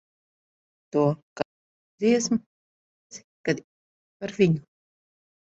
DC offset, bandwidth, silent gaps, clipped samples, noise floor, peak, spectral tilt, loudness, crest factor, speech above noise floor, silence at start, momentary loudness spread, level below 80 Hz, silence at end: under 0.1%; 8.2 kHz; 1.23-1.36 s, 1.45-1.98 s, 2.46-3.10 s, 3.24-3.44 s, 3.64-4.20 s; under 0.1%; under -90 dBFS; -8 dBFS; -5.5 dB/octave; -26 LUFS; 20 dB; over 67 dB; 0.95 s; 15 LU; -66 dBFS; 0.8 s